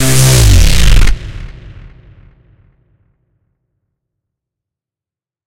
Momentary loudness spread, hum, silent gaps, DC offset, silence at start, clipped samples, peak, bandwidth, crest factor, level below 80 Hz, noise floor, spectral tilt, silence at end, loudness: 23 LU; none; none; under 0.1%; 0 s; under 0.1%; 0 dBFS; 17 kHz; 12 dB; -14 dBFS; -89 dBFS; -4 dB/octave; 3.65 s; -9 LUFS